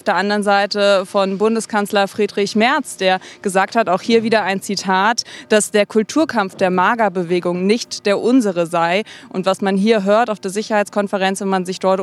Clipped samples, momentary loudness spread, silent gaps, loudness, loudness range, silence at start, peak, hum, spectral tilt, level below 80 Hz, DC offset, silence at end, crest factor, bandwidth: under 0.1%; 5 LU; none; -17 LUFS; 1 LU; 0.05 s; 0 dBFS; none; -4.5 dB/octave; -70 dBFS; under 0.1%; 0 s; 16 dB; 14 kHz